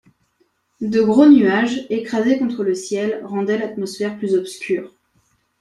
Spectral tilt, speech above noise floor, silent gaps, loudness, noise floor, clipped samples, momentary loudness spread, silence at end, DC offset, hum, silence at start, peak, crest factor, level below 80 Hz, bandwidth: -6 dB/octave; 47 dB; none; -18 LUFS; -64 dBFS; under 0.1%; 13 LU; 0.75 s; under 0.1%; none; 0.8 s; -2 dBFS; 18 dB; -62 dBFS; 12 kHz